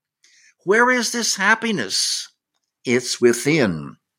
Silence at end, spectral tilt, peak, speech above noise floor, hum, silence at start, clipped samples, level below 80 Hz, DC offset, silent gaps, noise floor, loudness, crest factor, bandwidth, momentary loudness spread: 0.25 s; -3 dB/octave; -2 dBFS; 57 dB; none; 0.65 s; under 0.1%; -62 dBFS; under 0.1%; none; -76 dBFS; -18 LUFS; 20 dB; 16.5 kHz; 14 LU